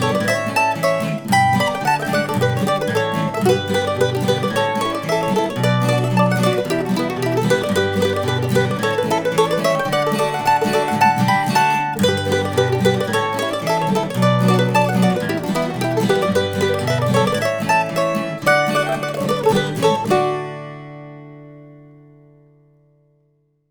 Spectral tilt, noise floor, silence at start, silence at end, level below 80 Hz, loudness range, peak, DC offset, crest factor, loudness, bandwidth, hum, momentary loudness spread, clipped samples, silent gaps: -5.5 dB/octave; -62 dBFS; 0 s; 1.85 s; -52 dBFS; 2 LU; -2 dBFS; under 0.1%; 16 dB; -18 LUFS; over 20 kHz; none; 5 LU; under 0.1%; none